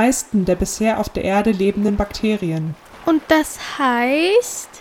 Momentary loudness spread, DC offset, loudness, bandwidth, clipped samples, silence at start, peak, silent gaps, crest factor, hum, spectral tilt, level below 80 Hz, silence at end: 9 LU; under 0.1%; -18 LUFS; 17 kHz; under 0.1%; 0 s; -2 dBFS; none; 16 dB; none; -4.5 dB/octave; -38 dBFS; 0 s